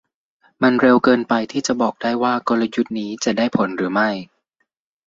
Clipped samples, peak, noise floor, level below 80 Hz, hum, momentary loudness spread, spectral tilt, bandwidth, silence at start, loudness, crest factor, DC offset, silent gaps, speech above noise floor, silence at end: under 0.1%; -2 dBFS; -72 dBFS; -60 dBFS; none; 8 LU; -5 dB/octave; 7.8 kHz; 0.6 s; -18 LUFS; 18 dB; under 0.1%; none; 54 dB; 0.8 s